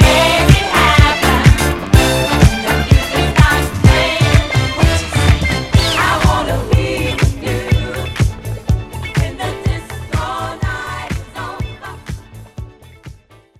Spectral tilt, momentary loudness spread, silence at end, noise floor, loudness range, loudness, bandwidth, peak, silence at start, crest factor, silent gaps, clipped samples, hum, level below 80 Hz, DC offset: -5 dB/octave; 14 LU; 0.45 s; -41 dBFS; 11 LU; -14 LUFS; 16 kHz; 0 dBFS; 0 s; 14 dB; none; 0.7%; none; -20 dBFS; under 0.1%